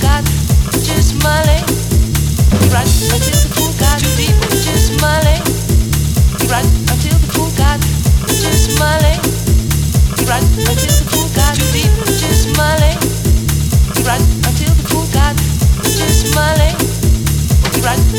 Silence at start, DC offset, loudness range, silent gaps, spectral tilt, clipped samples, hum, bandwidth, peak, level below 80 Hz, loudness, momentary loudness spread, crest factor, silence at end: 0 s; under 0.1%; 1 LU; none; -4.5 dB/octave; under 0.1%; none; 17.5 kHz; -2 dBFS; -16 dBFS; -12 LUFS; 2 LU; 10 dB; 0 s